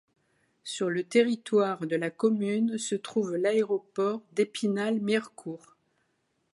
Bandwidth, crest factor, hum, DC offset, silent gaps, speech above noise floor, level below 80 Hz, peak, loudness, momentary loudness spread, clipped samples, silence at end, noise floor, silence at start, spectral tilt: 11.5 kHz; 20 dB; none; under 0.1%; none; 47 dB; -82 dBFS; -10 dBFS; -28 LUFS; 12 LU; under 0.1%; 1 s; -75 dBFS; 0.65 s; -5 dB/octave